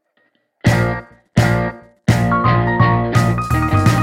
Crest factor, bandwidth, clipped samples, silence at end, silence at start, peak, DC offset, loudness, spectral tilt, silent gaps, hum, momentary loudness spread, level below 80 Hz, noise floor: 16 dB; 15.5 kHz; under 0.1%; 0 s; 0.65 s; 0 dBFS; under 0.1%; -16 LUFS; -6.5 dB/octave; none; none; 7 LU; -32 dBFS; -62 dBFS